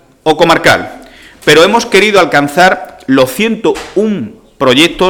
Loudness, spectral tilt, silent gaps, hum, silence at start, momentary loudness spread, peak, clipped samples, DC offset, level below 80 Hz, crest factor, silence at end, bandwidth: -9 LUFS; -4 dB/octave; none; none; 0.25 s; 9 LU; 0 dBFS; 0.5%; under 0.1%; -40 dBFS; 10 dB; 0 s; 19 kHz